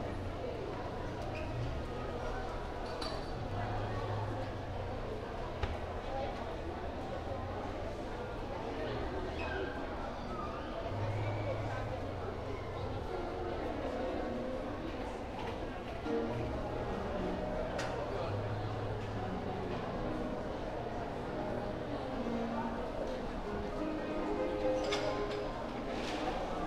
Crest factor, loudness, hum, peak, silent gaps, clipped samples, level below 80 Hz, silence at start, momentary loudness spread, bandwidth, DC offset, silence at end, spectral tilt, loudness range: 18 dB; -39 LUFS; none; -20 dBFS; none; under 0.1%; -46 dBFS; 0 s; 4 LU; 13.5 kHz; under 0.1%; 0 s; -6.5 dB/octave; 3 LU